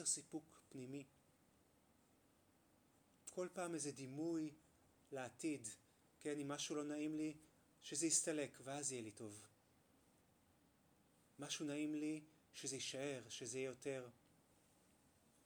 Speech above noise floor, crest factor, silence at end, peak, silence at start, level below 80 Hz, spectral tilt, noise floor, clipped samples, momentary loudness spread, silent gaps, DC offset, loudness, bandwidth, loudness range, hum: 29 dB; 24 dB; 1.35 s; -24 dBFS; 0 s; -88 dBFS; -3 dB/octave; -76 dBFS; under 0.1%; 13 LU; none; under 0.1%; -47 LUFS; over 20 kHz; 8 LU; none